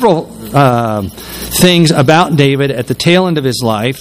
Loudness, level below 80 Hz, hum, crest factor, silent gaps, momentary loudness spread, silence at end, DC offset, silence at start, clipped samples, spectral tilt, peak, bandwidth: -11 LUFS; -38 dBFS; none; 10 dB; none; 9 LU; 0 s; under 0.1%; 0 s; 0.7%; -5 dB/octave; 0 dBFS; 16 kHz